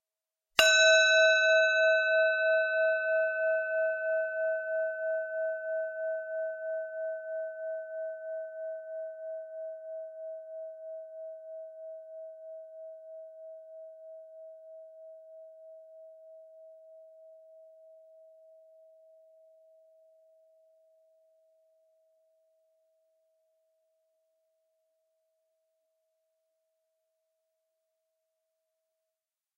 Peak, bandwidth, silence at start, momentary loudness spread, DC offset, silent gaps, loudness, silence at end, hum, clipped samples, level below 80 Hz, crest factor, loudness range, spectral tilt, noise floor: -4 dBFS; 13 kHz; 0.6 s; 27 LU; under 0.1%; none; -28 LUFS; 11.95 s; none; under 0.1%; -78 dBFS; 30 dB; 27 LU; 2 dB/octave; under -90 dBFS